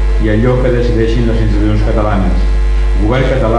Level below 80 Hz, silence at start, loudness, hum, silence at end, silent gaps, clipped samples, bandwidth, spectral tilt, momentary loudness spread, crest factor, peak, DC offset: -12 dBFS; 0 s; -13 LUFS; none; 0 s; none; under 0.1%; 7.2 kHz; -8 dB/octave; 3 LU; 10 dB; 0 dBFS; under 0.1%